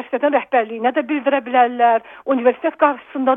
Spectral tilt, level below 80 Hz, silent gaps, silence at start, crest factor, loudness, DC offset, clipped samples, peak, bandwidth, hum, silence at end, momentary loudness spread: -7.5 dB/octave; -72 dBFS; none; 0 s; 16 dB; -18 LUFS; under 0.1%; under 0.1%; -2 dBFS; 3.8 kHz; none; 0 s; 5 LU